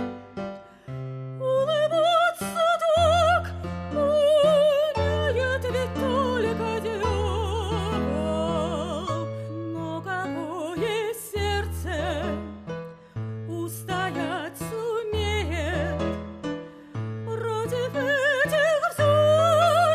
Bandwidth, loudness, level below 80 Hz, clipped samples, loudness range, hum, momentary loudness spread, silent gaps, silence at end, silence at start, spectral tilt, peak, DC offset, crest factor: 14 kHz; -25 LUFS; -42 dBFS; under 0.1%; 8 LU; none; 15 LU; none; 0 s; 0 s; -5.5 dB/octave; -10 dBFS; under 0.1%; 16 dB